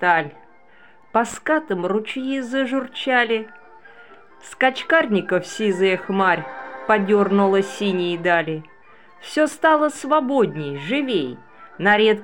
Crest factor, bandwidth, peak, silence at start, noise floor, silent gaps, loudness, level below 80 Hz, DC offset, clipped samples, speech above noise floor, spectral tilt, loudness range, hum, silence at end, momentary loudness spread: 16 dB; 17 kHz; -4 dBFS; 0 s; -52 dBFS; none; -20 LUFS; -66 dBFS; 0.3%; under 0.1%; 32 dB; -5 dB/octave; 3 LU; none; 0 s; 10 LU